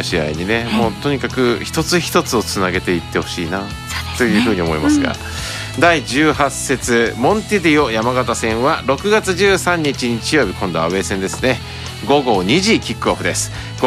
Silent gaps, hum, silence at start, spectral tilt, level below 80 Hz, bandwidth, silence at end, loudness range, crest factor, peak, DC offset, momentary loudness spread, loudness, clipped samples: none; none; 0 s; -4.5 dB/octave; -36 dBFS; 15.5 kHz; 0 s; 2 LU; 16 dB; 0 dBFS; under 0.1%; 8 LU; -16 LUFS; under 0.1%